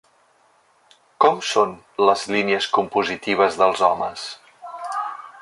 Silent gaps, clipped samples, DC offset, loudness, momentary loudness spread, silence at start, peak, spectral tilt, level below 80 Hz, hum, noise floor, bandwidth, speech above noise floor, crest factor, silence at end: none; under 0.1%; under 0.1%; -20 LUFS; 15 LU; 1.2 s; -2 dBFS; -3.5 dB/octave; -62 dBFS; none; -59 dBFS; 11.5 kHz; 39 dB; 20 dB; 0 s